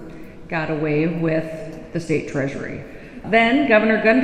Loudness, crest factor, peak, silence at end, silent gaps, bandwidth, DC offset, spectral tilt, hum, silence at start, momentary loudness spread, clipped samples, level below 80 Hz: -20 LUFS; 20 dB; 0 dBFS; 0 s; none; 10 kHz; under 0.1%; -6.5 dB/octave; none; 0 s; 19 LU; under 0.1%; -46 dBFS